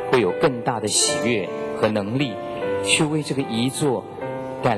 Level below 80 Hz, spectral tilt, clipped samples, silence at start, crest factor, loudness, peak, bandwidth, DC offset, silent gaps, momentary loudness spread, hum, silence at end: -54 dBFS; -3.5 dB/octave; under 0.1%; 0 s; 18 dB; -22 LUFS; -2 dBFS; 15 kHz; under 0.1%; none; 9 LU; none; 0 s